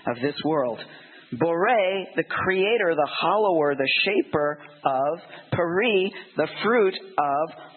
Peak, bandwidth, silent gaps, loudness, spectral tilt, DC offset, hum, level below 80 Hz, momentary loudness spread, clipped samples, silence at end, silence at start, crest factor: -6 dBFS; 4.4 kHz; none; -23 LUFS; -9.5 dB/octave; under 0.1%; none; -66 dBFS; 7 LU; under 0.1%; 0.1 s; 0.05 s; 18 dB